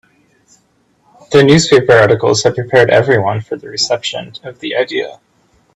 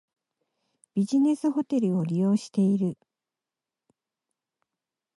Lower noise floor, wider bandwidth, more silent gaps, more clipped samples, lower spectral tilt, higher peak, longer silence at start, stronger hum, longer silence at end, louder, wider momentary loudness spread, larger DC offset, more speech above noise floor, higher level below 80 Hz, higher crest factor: second, -56 dBFS vs -90 dBFS; about the same, 11 kHz vs 11.5 kHz; neither; neither; second, -4.5 dB/octave vs -8 dB/octave; first, 0 dBFS vs -14 dBFS; first, 1.3 s vs 0.95 s; neither; second, 0.6 s vs 2.25 s; first, -12 LUFS vs -26 LUFS; first, 14 LU vs 8 LU; neither; second, 45 dB vs 65 dB; first, -48 dBFS vs -76 dBFS; about the same, 14 dB vs 14 dB